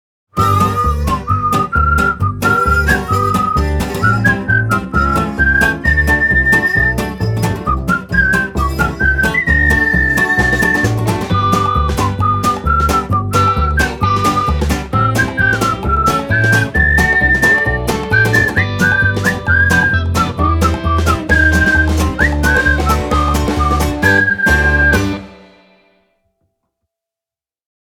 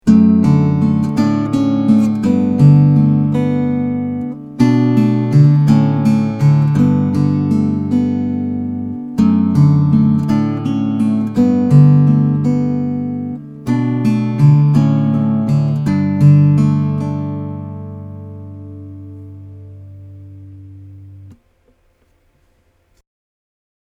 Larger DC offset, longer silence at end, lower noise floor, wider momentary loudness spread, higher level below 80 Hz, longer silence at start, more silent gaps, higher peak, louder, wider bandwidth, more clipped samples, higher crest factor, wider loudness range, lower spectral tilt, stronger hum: neither; about the same, 2.5 s vs 2.5 s; first, -90 dBFS vs -57 dBFS; second, 5 LU vs 16 LU; first, -24 dBFS vs -46 dBFS; first, 0.35 s vs 0.05 s; neither; about the same, 0 dBFS vs 0 dBFS; about the same, -13 LUFS vs -13 LUFS; first, 18 kHz vs 7.6 kHz; neither; about the same, 14 dB vs 14 dB; second, 2 LU vs 8 LU; second, -5.5 dB/octave vs -9.5 dB/octave; neither